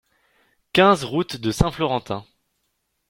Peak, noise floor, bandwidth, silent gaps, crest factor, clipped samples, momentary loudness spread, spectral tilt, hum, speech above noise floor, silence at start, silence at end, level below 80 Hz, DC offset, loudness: -2 dBFS; -73 dBFS; 16.5 kHz; none; 20 dB; under 0.1%; 12 LU; -5.5 dB/octave; none; 53 dB; 0.75 s; 0.85 s; -40 dBFS; under 0.1%; -21 LUFS